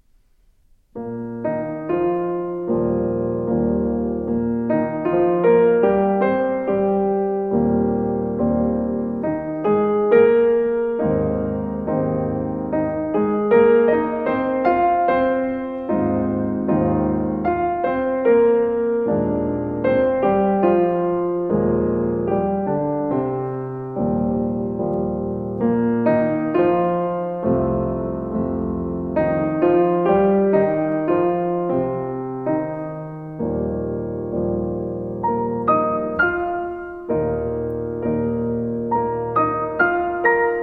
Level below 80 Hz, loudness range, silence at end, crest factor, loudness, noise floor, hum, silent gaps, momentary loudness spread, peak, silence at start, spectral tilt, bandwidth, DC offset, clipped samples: -42 dBFS; 4 LU; 0 s; 16 dB; -20 LUFS; -56 dBFS; none; none; 9 LU; -4 dBFS; 0.95 s; -11 dB/octave; 4.6 kHz; under 0.1%; under 0.1%